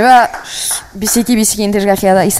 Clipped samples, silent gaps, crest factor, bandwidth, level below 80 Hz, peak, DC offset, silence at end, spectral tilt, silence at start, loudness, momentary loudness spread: 0.3%; none; 12 dB; 16.5 kHz; -40 dBFS; 0 dBFS; under 0.1%; 0 s; -3.5 dB/octave; 0 s; -12 LUFS; 7 LU